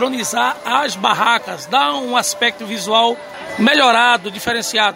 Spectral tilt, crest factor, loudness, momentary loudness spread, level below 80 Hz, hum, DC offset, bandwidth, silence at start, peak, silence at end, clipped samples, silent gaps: -2 dB/octave; 16 dB; -15 LUFS; 8 LU; -60 dBFS; none; under 0.1%; 16.5 kHz; 0 s; 0 dBFS; 0 s; under 0.1%; none